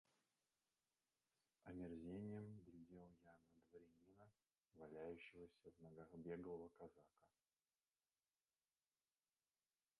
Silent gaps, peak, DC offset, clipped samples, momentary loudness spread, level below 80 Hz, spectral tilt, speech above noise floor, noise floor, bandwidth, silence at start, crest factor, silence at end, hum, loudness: none; -42 dBFS; under 0.1%; under 0.1%; 12 LU; -82 dBFS; -8 dB/octave; over 31 dB; under -90 dBFS; 10.5 kHz; 1.65 s; 20 dB; 2.75 s; none; -59 LUFS